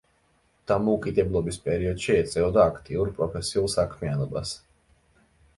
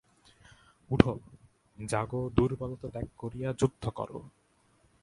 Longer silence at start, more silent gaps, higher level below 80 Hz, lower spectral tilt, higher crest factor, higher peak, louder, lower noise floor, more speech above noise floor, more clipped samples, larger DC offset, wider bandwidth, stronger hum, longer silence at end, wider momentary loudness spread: second, 0.7 s vs 0.9 s; neither; about the same, -44 dBFS vs -48 dBFS; second, -5.5 dB/octave vs -7 dB/octave; second, 20 dB vs 32 dB; second, -6 dBFS vs 0 dBFS; first, -26 LUFS vs -32 LUFS; about the same, -66 dBFS vs -67 dBFS; first, 41 dB vs 37 dB; neither; neither; about the same, 11.5 kHz vs 11.5 kHz; neither; first, 1 s vs 0.75 s; second, 8 LU vs 14 LU